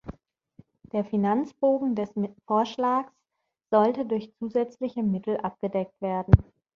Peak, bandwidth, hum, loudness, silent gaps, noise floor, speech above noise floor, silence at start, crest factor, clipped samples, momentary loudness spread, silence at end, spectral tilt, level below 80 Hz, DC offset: -2 dBFS; 7 kHz; none; -26 LUFS; none; -82 dBFS; 56 dB; 0.05 s; 24 dB; under 0.1%; 9 LU; 0.35 s; -9 dB/octave; -40 dBFS; under 0.1%